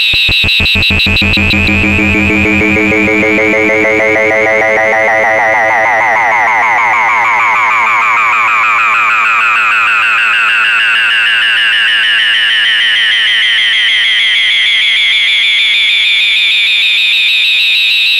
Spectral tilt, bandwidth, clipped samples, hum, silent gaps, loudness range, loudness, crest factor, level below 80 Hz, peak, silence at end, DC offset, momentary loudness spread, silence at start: -3 dB/octave; 16.5 kHz; under 0.1%; none; none; 2 LU; -7 LUFS; 8 dB; -32 dBFS; 0 dBFS; 0 s; under 0.1%; 2 LU; 0 s